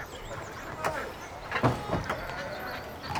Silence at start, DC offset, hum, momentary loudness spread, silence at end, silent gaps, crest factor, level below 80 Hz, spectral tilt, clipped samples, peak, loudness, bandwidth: 0 s; under 0.1%; none; 11 LU; 0 s; none; 22 dB; -48 dBFS; -5.5 dB/octave; under 0.1%; -10 dBFS; -33 LUFS; over 20 kHz